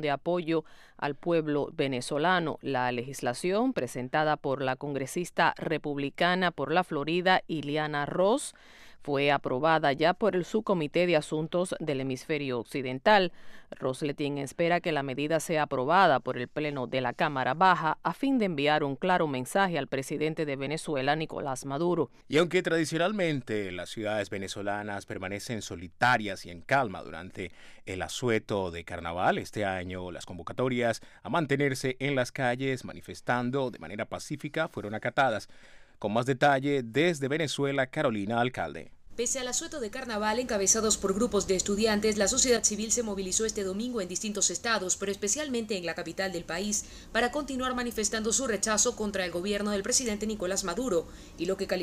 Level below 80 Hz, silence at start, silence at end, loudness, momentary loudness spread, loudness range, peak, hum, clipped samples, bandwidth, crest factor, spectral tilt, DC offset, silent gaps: -56 dBFS; 0 s; 0 s; -29 LUFS; 10 LU; 5 LU; -10 dBFS; none; under 0.1%; 15.5 kHz; 20 dB; -3.5 dB/octave; under 0.1%; none